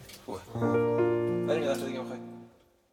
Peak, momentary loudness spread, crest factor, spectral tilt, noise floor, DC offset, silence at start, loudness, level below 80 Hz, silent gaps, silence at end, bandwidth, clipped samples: -16 dBFS; 16 LU; 14 dB; -7 dB/octave; -58 dBFS; under 0.1%; 0 s; -30 LUFS; -66 dBFS; none; 0.45 s; 16.5 kHz; under 0.1%